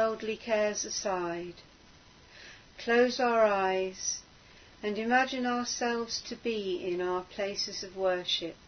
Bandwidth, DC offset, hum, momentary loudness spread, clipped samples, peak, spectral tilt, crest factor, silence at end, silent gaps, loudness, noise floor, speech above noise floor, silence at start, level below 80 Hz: 6.6 kHz; under 0.1%; none; 13 LU; under 0.1%; -12 dBFS; -2.5 dB/octave; 18 dB; 0 s; none; -31 LUFS; -57 dBFS; 26 dB; 0 s; -64 dBFS